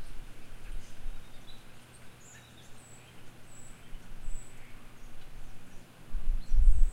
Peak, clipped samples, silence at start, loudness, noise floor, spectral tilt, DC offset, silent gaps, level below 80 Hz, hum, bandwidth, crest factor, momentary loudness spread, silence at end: -8 dBFS; under 0.1%; 0 s; -41 LUFS; -52 dBFS; -5 dB/octave; under 0.1%; none; -32 dBFS; none; 9.2 kHz; 20 dB; 17 LU; 0 s